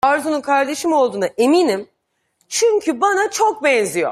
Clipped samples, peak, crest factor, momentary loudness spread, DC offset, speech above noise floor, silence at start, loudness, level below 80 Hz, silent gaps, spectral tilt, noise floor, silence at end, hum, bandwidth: under 0.1%; -2 dBFS; 14 dB; 4 LU; under 0.1%; 50 dB; 0.05 s; -17 LUFS; -62 dBFS; none; -3 dB/octave; -66 dBFS; 0 s; none; 15 kHz